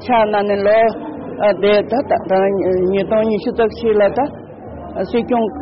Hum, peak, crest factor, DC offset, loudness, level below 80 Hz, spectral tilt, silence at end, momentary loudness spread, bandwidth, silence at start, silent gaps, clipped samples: none; -6 dBFS; 10 dB; under 0.1%; -16 LUFS; -44 dBFS; -4.5 dB/octave; 0 s; 13 LU; 5.8 kHz; 0 s; none; under 0.1%